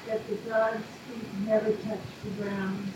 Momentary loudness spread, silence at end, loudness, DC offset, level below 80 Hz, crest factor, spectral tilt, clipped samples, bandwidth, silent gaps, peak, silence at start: 11 LU; 0 s; -31 LUFS; under 0.1%; -66 dBFS; 16 dB; -6.5 dB/octave; under 0.1%; 16.5 kHz; none; -14 dBFS; 0 s